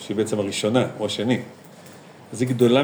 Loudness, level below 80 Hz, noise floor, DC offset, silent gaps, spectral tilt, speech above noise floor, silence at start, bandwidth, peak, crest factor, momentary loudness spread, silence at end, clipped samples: -23 LUFS; -74 dBFS; -44 dBFS; under 0.1%; none; -5.5 dB/octave; 23 dB; 0 s; over 20 kHz; -4 dBFS; 18 dB; 24 LU; 0 s; under 0.1%